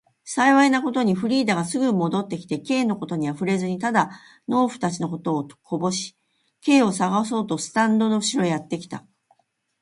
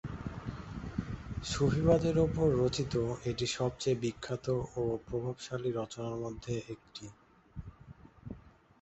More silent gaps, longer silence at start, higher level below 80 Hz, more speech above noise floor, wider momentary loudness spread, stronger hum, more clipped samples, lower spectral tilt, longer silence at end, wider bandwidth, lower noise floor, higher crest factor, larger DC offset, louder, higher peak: neither; first, 0.25 s vs 0.05 s; second, -68 dBFS vs -50 dBFS; first, 43 dB vs 22 dB; second, 11 LU vs 21 LU; neither; neither; about the same, -5 dB/octave vs -6 dB/octave; first, 0.85 s vs 0.35 s; first, 11.5 kHz vs 8.2 kHz; first, -65 dBFS vs -55 dBFS; about the same, 18 dB vs 20 dB; neither; first, -22 LUFS vs -34 LUFS; first, -4 dBFS vs -14 dBFS